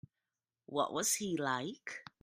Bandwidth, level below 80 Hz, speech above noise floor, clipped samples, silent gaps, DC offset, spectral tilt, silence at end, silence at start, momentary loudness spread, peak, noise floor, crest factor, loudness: 15.5 kHz; -78 dBFS; over 53 dB; under 0.1%; none; under 0.1%; -2.5 dB/octave; 0.2 s; 0.7 s; 12 LU; -20 dBFS; under -90 dBFS; 20 dB; -36 LUFS